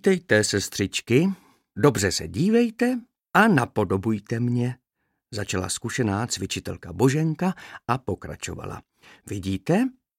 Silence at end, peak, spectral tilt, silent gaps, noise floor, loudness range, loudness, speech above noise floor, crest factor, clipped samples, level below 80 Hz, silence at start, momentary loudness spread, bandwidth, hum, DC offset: 0.3 s; -2 dBFS; -5 dB/octave; none; -77 dBFS; 5 LU; -24 LUFS; 54 dB; 22 dB; under 0.1%; -54 dBFS; 0.05 s; 14 LU; 16.5 kHz; none; under 0.1%